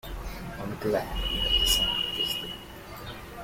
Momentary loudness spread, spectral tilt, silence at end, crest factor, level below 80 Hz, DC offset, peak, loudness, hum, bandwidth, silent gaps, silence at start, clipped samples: 19 LU; -2.5 dB/octave; 0 s; 18 dB; -38 dBFS; under 0.1%; -12 dBFS; -26 LUFS; none; 16.5 kHz; none; 0.05 s; under 0.1%